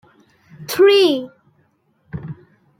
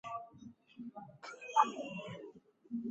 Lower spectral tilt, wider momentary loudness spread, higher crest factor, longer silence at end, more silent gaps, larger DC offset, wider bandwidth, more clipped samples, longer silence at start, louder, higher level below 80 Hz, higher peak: about the same, -4.5 dB/octave vs -3.5 dB/octave; about the same, 25 LU vs 23 LU; second, 16 dB vs 26 dB; first, 0.45 s vs 0 s; neither; neither; first, 16.5 kHz vs 8 kHz; neither; first, 0.6 s vs 0.05 s; first, -15 LUFS vs -37 LUFS; first, -58 dBFS vs -82 dBFS; first, -4 dBFS vs -14 dBFS